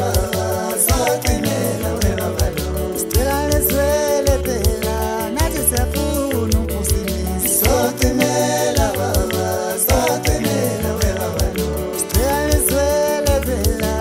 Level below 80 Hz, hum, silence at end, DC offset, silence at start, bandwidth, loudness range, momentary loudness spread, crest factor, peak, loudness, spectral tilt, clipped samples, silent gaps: -24 dBFS; none; 0 s; under 0.1%; 0 s; 16.5 kHz; 2 LU; 5 LU; 16 dB; -2 dBFS; -18 LUFS; -4.5 dB/octave; under 0.1%; none